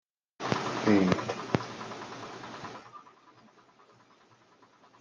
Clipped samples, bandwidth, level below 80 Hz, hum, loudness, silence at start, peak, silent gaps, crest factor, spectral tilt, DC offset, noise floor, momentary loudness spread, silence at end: under 0.1%; 9.4 kHz; -70 dBFS; none; -31 LUFS; 0.4 s; -8 dBFS; none; 26 dB; -6 dB/octave; under 0.1%; -62 dBFS; 20 LU; 1.7 s